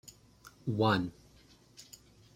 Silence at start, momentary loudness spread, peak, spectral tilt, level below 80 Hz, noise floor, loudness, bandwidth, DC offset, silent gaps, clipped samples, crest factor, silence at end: 0.45 s; 26 LU; -14 dBFS; -6 dB/octave; -66 dBFS; -61 dBFS; -32 LUFS; 16 kHz; under 0.1%; none; under 0.1%; 22 dB; 0.5 s